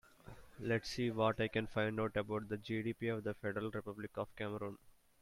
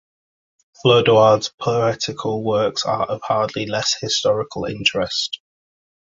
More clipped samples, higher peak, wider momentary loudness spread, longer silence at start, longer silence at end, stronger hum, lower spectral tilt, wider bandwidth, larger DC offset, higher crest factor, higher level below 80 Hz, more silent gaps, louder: neither; second, -20 dBFS vs -2 dBFS; about the same, 12 LU vs 10 LU; second, 0.25 s vs 0.85 s; second, 0.3 s vs 0.65 s; neither; first, -6.5 dB/octave vs -4 dB/octave; first, 15.5 kHz vs 8 kHz; neither; about the same, 20 dB vs 18 dB; second, -64 dBFS vs -54 dBFS; second, none vs 1.54-1.58 s; second, -40 LUFS vs -19 LUFS